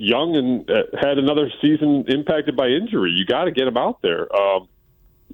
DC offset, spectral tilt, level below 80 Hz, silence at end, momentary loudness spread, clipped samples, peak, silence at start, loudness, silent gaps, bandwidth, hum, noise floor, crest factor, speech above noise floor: under 0.1%; -7.5 dB/octave; -56 dBFS; 0.7 s; 3 LU; under 0.1%; -6 dBFS; 0 s; -19 LUFS; none; 17 kHz; none; -55 dBFS; 14 dB; 37 dB